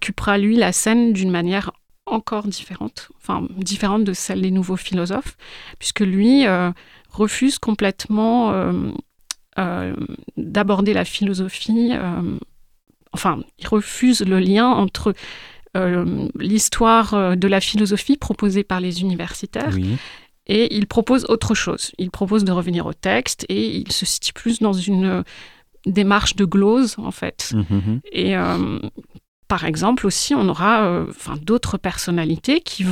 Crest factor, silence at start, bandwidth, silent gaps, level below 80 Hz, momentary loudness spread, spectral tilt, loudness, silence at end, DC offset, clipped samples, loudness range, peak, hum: 16 dB; 0 s; 15.5 kHz; 29.28-29.43 s; -42 dBFS; 13 LU; -5 dB/octave; -19 LUFS; 0 s; under 0.1%; under 0.1%; 4 LU; -4 dBFS; none